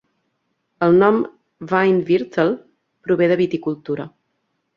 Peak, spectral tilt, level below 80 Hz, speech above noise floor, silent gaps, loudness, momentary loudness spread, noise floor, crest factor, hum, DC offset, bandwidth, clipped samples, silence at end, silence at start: -2 dBFS; -8.5 dB/octave; -60 dBFS; 54 dB; none; -18 LUFS; 15 LU; -71 dBFS; 18 dB; none; under 0.1%; 6.6 kHz; under 0.1%; 0.7 s; 0.8 s